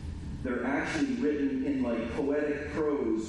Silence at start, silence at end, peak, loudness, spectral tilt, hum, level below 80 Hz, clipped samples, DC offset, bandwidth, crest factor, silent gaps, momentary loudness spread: 0 s; 0 s; -18 dBFS; -31 LUFS; -6.5 dB/octave; none; -48 dBFS; under 0.1%; under 0.1%; 11 kHz; 12 dB; none; 4 LU